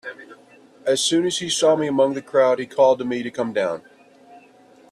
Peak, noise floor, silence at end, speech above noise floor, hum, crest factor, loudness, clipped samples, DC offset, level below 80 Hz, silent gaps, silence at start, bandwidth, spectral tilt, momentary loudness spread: -4 dBFS; -51 dBFS; 0.55 s; 31 dB; none; 16 dB; -20 LUFS; under 0.1%; under 0.1%; -68 dBFS; none; 0.05 s; 13 kHz; -3.5 dB/octave; 9 LU